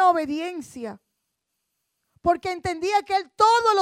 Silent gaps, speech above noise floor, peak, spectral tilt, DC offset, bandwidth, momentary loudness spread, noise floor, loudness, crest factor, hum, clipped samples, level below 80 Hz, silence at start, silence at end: none; 56 dB; -6 dBFS; -3.5 dB/octave; under 0.1%; 15 kHz; 17 LU; -79 dBFS; -23 LUFS; 18 dB; none; under 0.1%; -56 dBFS; 0 s; 0 s